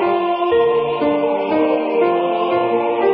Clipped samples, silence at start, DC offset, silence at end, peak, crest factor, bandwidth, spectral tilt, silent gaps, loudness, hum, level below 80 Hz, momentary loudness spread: under 0.1%; 0 s; under 0.1%; 0 s; -4 dBFS; 12 dB; 5.2 kHz; -10.5 dB/octave; none; -17 LUFS; none; -56 dBFS; 2 LU